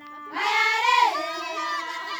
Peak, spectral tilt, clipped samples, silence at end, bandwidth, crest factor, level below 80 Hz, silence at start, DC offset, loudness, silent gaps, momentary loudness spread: -8 dBFS; 0.5 dB/octave; under 0.1%; 0 s; over 20 kHz; 16 dB; -78 dBFS; 0 s; under 0.1%; -23 LUFS; none; 10 LU